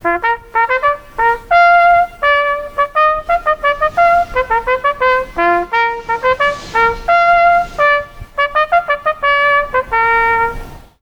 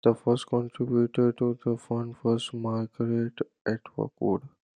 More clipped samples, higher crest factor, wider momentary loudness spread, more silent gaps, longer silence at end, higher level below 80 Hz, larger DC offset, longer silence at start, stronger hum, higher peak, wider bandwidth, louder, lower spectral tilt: neither; second, 12 dB vs 20 dB; about the same, 7 LU vs 8 LU; second, none vs 3.61-3.65 s; about the same, 0.25 s vs 0.3 s; first, -36 dBFS vs -70 dBFS; neither; about the same, 0.05 s vs 0.05 s; neither; first, -2 dBFS vs -8 dBFS; first, 19 kHz vs 10 kHz; first, -13 LUFS vs -29 LUFS; second, -4 dB/octave vs -7.5 dB/octave